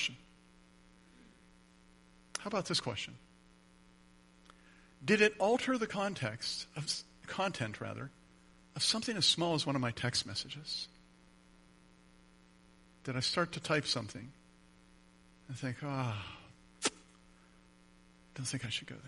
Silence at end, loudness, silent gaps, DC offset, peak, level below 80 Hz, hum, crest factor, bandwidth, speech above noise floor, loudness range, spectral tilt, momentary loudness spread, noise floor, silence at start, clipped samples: 0 s; -35 LUFS; none; under 0.1%; -14 dBFS; -68 dBFS; none; 26 dB; 11.5 kHz; 28 dB; 8 LU; -3.5 dB/octave; 18 LU; -63 dBFS; 0 s; under 0.1%